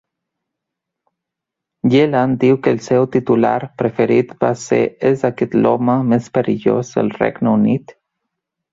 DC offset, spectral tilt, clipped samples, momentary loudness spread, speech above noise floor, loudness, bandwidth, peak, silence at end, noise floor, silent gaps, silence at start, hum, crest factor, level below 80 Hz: under 0.1%; -7.5 dB/octave; under 0.1%; 5 LU; 67 dB; -16 LUFS; 7.8 kHz; -2 dBFS; 0.8 s; -82 dBFS; none; 1.85 s; none; 16 dB; -56 dBFS